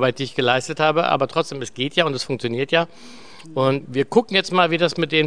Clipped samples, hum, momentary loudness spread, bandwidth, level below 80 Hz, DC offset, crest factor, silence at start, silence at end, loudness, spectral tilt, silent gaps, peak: under 0.1%; none; 7 LU; 10 kHz; -62 dBFS; 0.7%; 20 dB; 0 s; 0 s; -20 LUFS; -5 dB/octave; none; -2 dBFS